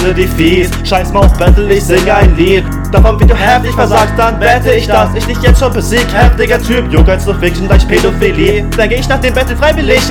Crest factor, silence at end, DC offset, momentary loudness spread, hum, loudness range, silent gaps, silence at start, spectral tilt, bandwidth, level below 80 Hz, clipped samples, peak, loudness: 8 dB; 0 s; under 0.1%; 4 LU; none; 1 LU; none; 0 s; -5.5 dB/octave; 18 kHz; -12 dBFS; 3%; 0 dBFS; -9 LUFS